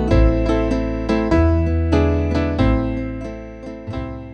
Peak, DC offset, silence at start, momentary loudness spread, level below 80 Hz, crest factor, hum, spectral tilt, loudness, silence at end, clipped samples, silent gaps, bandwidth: -2 dBFS; under 0.1%; 0 s; 14 LU; -24 dBFS; 16 dB; none; -8.5 dB/octave; -19 LUFS; 0 s; under 0.1%; none; 8.2 kHz